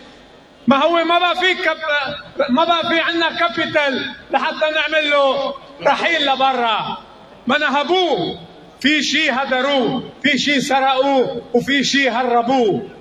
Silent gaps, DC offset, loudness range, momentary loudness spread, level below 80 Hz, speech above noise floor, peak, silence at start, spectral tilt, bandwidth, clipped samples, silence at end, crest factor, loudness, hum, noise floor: none; under 0.1%; 1 LU; 7 LU; -56 dBFS; 27 dB; 0 dBFS; 0 s; -3.5 dB/octave; 13 kHz; under 0.1%; 0 s; 16 dB; -16 LUFS; none; -44 dBFS